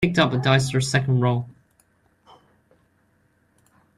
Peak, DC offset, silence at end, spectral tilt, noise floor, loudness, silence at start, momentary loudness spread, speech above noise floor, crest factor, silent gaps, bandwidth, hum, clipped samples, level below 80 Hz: -4 dBFS; under 0.1%; 2.45 s; -5.5 dB/octave; -64 dBFS; -21 LUFS; 0 s; 7 LU; 44 dB; 20 dB; none; 12 kHz; none; under 0.1%; -54 dBFS